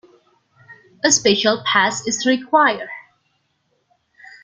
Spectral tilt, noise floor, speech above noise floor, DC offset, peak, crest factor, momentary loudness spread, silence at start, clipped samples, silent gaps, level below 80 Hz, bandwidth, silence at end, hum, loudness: -1.5 dB/octave; -67 dBFS; 50 dB; under 0.1%; 0 dBFS; 20 dB; 13 LU; 0.7 s; under 0.1%; none; -64 dBFS; 10.5 kHz; 1.45 s; none; -17 LUFS